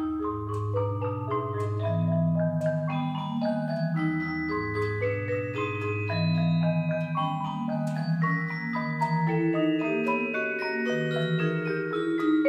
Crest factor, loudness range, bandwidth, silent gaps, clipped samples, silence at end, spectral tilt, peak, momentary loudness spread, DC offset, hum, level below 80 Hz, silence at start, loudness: 14 dB; 2 LU; 8 kHz; none; under 0.1%; 0 s; -8.5 dB/octave; -12 dBFS; 5 LU; under 0.1%; none; -58 dBFS; 0 s; -28 LUFS